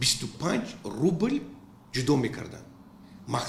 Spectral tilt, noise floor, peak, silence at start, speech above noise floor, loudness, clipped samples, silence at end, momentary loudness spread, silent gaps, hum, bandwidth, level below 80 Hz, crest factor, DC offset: -4.5 dB/octave; -50 dBFS; -12 dBFS; 0 s; 22 dB; -29 LUFS; under 0.1%; 0 s; 18 LU; none; none; 15 kHz; -56 dBFS; 18 dB; under 0.1%